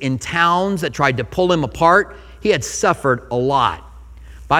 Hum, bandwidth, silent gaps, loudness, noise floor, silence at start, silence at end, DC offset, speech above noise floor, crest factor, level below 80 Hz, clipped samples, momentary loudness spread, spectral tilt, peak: none; 16.5 kHz; none; -17 LUFS; -38 dBFS; 0 s; 0 s; under 0.1%; 21 dB; 18 dB; -40 dBFS; under 0.1%; 7 LU; -4.5 dB/octave; 0 dBFS